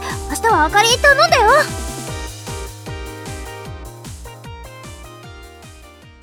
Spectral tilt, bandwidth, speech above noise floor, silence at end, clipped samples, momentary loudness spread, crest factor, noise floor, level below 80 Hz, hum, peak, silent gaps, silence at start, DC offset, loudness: -2.5 dB/octave; 19.5 kHz; 29 dB; 0.15 s; under 0.1%; 24 LU; 18 dB; -41 dBFS; -34 dBFS; none; 0 dBFS; none; 0 s; under 0.1%; -14 LUFS